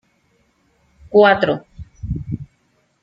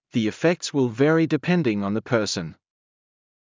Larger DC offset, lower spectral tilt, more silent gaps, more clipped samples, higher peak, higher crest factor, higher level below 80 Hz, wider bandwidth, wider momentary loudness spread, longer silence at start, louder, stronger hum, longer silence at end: neither; first, -7.5 dB/octave vs -6 dB/octave; neither; neither; first, -2 dBFS vs -8 dBFS; about the same, 18 dB vs 16 dB; first, -42 dBFS vs -60 dBFS; second, 5.4 kHz vs 7.6 kHz; first, 18 LU vs 7 LU; first, 1.1 s vs 0.15 s; first, -17 LUFS vs -22 LUFS; neither; second, 0.6 s vs 0.9 s